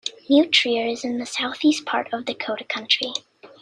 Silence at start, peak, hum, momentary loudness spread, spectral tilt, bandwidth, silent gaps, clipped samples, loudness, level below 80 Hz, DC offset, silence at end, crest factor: 0.05 s; -2 dBFS; none; 11 LU; -2 dB/octave; 10.5 kHz; none; under 0.1%; -21 LUFS; -68 dBFS; under 0.1%; 0.15 s; 20 dB